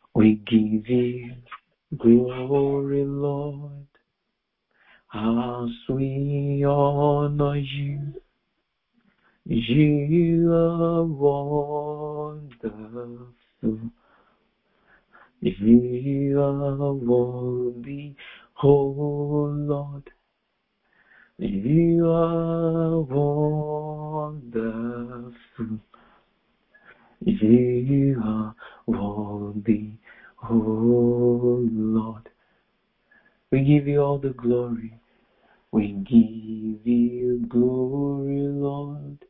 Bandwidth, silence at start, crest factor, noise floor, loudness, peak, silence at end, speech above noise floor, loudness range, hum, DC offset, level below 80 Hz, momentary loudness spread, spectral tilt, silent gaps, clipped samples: 3.9 kHz; 0.15 s; 20 dB; -78 dBFS; -23 LUFS; -4 dBFS; 0.15 s; 56 dB; 6 LU; none; under 0.1%; -50 dBFS; 16 LU; -13 dB/octave; none; under 0.1%